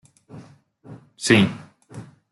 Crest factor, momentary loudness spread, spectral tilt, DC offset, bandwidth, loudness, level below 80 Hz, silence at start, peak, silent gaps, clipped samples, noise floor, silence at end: 22 dB; 25 LU; -4.5 dB/octave; under 0.1%; 12 kHz; -19 LUFS; -60 dBFS; 0.35 s; -4 dBFS; none; under 0.1%; -49 dBFS; 0.3 s